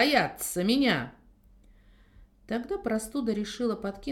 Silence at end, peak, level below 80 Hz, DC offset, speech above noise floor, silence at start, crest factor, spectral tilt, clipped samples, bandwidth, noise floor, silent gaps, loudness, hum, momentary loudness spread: 0 s; -8 dBFS; -56 dBFS; under 0.1%; 29 dB; 0 s; 22 dB; -4 dB/octave; under 0.1%; 18 kHz; -57 dBFS; none; -29 LUFS; none; 10 LU